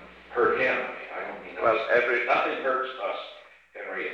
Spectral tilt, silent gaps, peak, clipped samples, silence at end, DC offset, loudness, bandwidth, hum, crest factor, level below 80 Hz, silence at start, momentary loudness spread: -5 dB/octave; none; -10 dBFS; under 0.1%; 0 s; under 0.1%; -26 LUFS; 7.6 kHz; none; 18 dB; -64 dBFS; 0 s; 14 LU